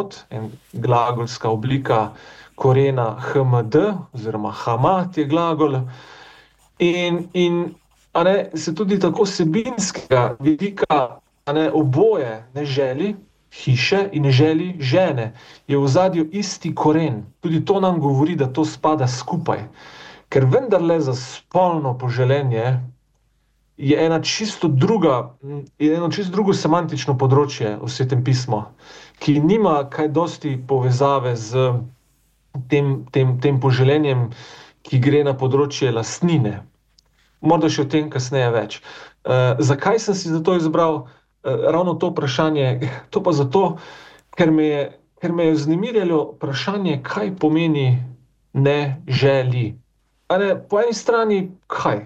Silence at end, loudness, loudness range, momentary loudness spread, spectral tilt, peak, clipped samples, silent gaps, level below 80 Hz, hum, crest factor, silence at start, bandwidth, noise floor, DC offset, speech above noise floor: 0 s; -19 LUFS; 2 LU; 10 LU; -6.5 dB/octave; -4 dBFS; under 0.1%; none; -56 dBFS; none; 14 dB; 0 s; 8.2 kHz; -63 dBFS; under 0.1%; 44 dB